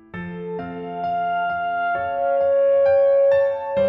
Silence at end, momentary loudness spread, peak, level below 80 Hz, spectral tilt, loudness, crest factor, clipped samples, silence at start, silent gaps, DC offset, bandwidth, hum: 0 s; 14 LU; -10 dBFS; -58 dBFS; -8 dB/octave; -20 LUFS; 10 dB; under 0.1%; 0.15 s; none; under 0.1%; 4.3 kHz; none